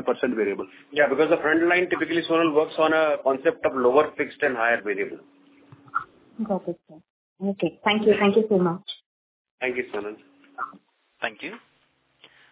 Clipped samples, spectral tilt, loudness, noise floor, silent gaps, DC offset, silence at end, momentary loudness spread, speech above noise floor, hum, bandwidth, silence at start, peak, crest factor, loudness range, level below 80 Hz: under 0.1%; -9.5 dB/octave; -23 LUFS; -66 dBFS; 7.10-7.36 s, 9.06-9.45 s, 9.51-9.58 s; under 0.1%; 0.95 s; 16 LU; 43 dB; none; 4 kHz; 0 s; -6 dBFS; 20 dB; 10 LU; -66 dBFS